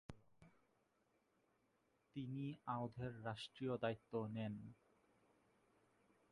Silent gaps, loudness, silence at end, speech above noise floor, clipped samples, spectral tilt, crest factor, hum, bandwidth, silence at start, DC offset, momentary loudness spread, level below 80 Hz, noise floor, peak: none; -48 LUFS; 1.55 s; 35 dB; under 0.1%; -7.5 dB/octave; 22 dB; none; 11 kHz; 0.1 s; under 0.1%; 12 LU; -78 dBFS; -82 dBFS; -28 dBFS